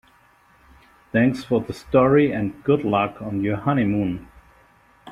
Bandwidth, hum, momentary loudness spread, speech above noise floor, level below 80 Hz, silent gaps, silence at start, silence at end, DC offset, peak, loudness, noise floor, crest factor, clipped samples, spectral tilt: 12 kHz; none; 8 LU; 36 dB; -50 dBFS; none; 1.15 s; 0 s; under 0.1%; -4 dBFS; -21 LUFS; -56 dBFS; 18 dB; under 0.1%; -8.5 dB/octave